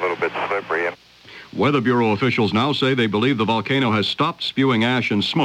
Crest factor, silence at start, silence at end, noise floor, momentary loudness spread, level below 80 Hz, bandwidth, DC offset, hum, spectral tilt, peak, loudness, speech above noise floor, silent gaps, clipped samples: 14 dB; 0 s; 0 s; -43 dBFS; 5 LU; -60 dBFS; 12 kHz; under 0.1%; none; -6.5 dB/octave; -6 dBFS; -19 LUFS; 24 dB; none; under 0.1%